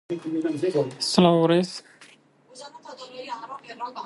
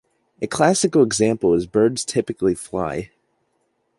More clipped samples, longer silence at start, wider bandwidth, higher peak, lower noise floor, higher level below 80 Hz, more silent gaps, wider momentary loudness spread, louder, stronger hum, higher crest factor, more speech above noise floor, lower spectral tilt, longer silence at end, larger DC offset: neither; second, 0.1 s vs 0.4 s; about the same, 11.5 kHz vs 11.5 kHz; about the same, -4 dBFS vs -2 dBFS; second, -55 dBFS vs -69 dBFS; second, -66 dBFS vs -52 dBFS; neither; first, 23 LU vs 11 LU; second, -22 LUFS vs -19 LUFS; neither; about the same, 22 dB vs 18 dB; second, 31 dB vs 50 dB; about the same, -5.5 dB/octave vs -4.5 dB/octave; second, 0 s vs 0.95 s; neither